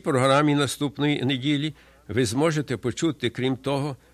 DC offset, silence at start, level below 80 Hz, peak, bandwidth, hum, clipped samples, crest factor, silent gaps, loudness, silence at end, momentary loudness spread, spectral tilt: under 0.1%; 0.05 s; -56 dBFS; -6 dBFS; 14 kHz; none; under 0.1%; 18 dB; none; -24 LUFS; 0.15 s; 8 LU; -5.5 dB/octave